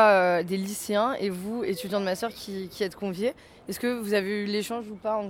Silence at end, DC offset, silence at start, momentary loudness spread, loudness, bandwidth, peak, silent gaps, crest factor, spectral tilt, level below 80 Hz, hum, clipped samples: 0 s; under 0.1%; 0 s; 8 LU; -28 LUFS; 17.5 kHz; -8 dBFS; none; 20 dB; -4.5 dB/octave; -64 dBFS; none; under 0.1%